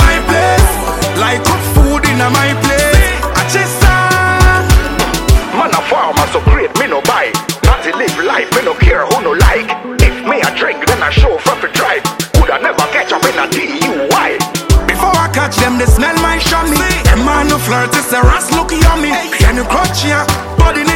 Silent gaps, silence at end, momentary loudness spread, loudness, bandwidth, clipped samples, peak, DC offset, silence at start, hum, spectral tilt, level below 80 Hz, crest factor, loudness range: none; 0 s; 4 LU; -11 LUFS; 17 kHz; 0.2%; 0 dBFS; under 0.1%; 0 s; none; -4.5 dB/octave; -16 dBFS; 10 dB; 2 LU